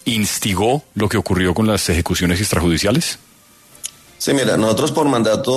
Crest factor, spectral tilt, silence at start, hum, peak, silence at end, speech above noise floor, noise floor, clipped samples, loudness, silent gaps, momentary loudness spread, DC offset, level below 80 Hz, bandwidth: 14 dB; -4.5 dB/octave; 0.05 s; none; -4 dBFS; 0 s; 31 dB; -47 dBFS; under 0.1%; -17 LUFS; none; 10 LU; under 0.1%; -36 dBFS; 13.5 kHz